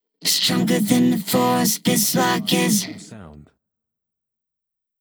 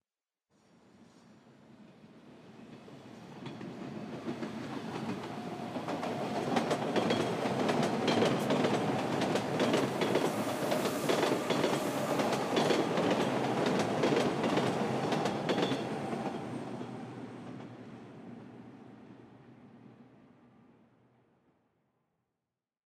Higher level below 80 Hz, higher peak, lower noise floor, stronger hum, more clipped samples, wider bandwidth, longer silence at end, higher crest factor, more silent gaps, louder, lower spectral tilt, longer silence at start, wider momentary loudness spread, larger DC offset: first, -62 dBFS vs -72 dBFS; first, -2 dBFS vs -14 dBFS; second, -76 dBFS vs under -90 dBFS; neither; neither; first, over 20 kHz vs 15.5 kHz; second, 1.6 s vs 2.9 s; about the same, 20 dB vs 20 dB; neither; first, -18 LUFS vs -32 LUFS; second, -3.5 dB/octave vs -5 dB/octave; second, 0.2 s vs 1 s; second, 3 LU vs 20 LU; neither